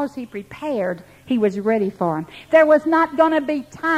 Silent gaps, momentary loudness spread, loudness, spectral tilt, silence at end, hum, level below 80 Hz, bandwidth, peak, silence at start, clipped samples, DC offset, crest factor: none; 14 LU; -19 LUFS; -7 dB/octave; 0 s; none; -60 dBFS; 12.5 kHz; -2 dBFS; 0 s; under 0.1%; under 0.1%; 16 dB